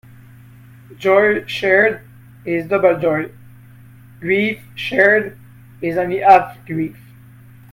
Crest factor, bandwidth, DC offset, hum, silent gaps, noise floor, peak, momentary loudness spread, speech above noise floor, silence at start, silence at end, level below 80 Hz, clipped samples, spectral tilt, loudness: 18 dB; 16.5 kHz; under 0.1%; none; none; -43 dBFS; 0 dBFS; 15 LU; 27 dB; 0.9 s; 0.8 s; -56 dBFS; under 0.1%; -6.5 dB/octave; -16 LUFS